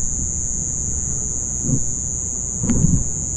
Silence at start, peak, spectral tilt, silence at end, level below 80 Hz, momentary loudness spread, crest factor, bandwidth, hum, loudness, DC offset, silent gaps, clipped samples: 0 s; -4 dBFS; -5.5 dB/octave; 0 s; -30 dBFS; 4 LU; 16 dB; 11.5 kHz; none; -20 LUFS; under 0.1%; none; under 0.1%